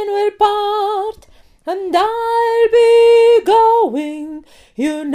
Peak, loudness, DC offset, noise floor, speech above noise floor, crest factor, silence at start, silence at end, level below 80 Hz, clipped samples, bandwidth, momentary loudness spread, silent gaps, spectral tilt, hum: 0 dBFS; -13 LUFS; under 0.1%; -45 dBFS; 32 dB; 14 dB; 0 s; 0 s; -52 dBFS; under 0.1%; 13 kHz; 18 LU; none; -3.5 dB/octave; none